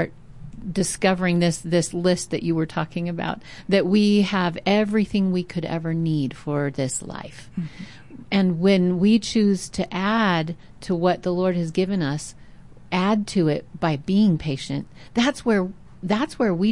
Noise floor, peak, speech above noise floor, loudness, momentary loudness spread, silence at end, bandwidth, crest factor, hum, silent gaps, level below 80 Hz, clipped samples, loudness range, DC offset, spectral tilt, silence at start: -46 dBFS; -8 dBFS; 24 dB; -22 LUFS; 13 LU; 0 s; 11.5 kHz; 14 dB; none; none; -50 dBFS; under 0.1%; 3 LU; 0.5%; -5.5 dB/octave; 0 s